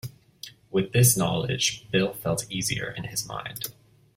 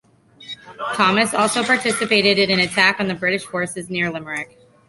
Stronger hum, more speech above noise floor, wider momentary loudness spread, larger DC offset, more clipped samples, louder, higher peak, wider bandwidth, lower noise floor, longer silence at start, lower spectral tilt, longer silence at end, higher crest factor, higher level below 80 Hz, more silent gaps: neither; about the same, 22 dB vs 22 dB; first, 19 LU vs 14 LU; neither; neither; second, -25 LUFS vs -18 LUFS; second, -6 dBFS vs -2 dBFS; first, 16.5 kHz vs 11.5 kHz; first, -47 dBFS vs -41 dBFS; second, 0.05 s vs 0.4 s; about the same, -4 dB/octave vs -3.5 dB/octave; about the same, 0.45 s vs 0.45 s; about the same, 20 dB vs 18 dB; first, -54 dBFS vs -60 dBFS; neither